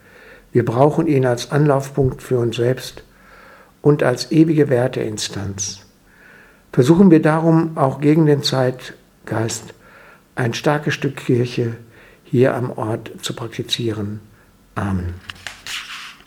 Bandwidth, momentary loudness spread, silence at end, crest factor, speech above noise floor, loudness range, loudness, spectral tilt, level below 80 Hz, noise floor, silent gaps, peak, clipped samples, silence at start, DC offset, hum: 16 kHz; 15 LU; 0.15 s; 18 dB; 31 dB; 7 LU; -18 LUFS; -6 dB/octave; -48 dBFS; -48 dBFS; none; 0 dBFS; under 0.1%; 0.55 s; under 0.1%; none